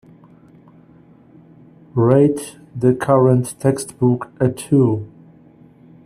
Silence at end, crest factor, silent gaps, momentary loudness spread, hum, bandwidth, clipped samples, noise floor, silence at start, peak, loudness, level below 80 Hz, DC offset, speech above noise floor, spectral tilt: 1 s; 18 dB; none; 12 LU; none; 14 kHz; under 0.1%; -47 dBFS; 1.95 s; 0 dBFS; -17 LUFS; -56 dBFS; under 0.1%; 32 dB; -8 dB/octave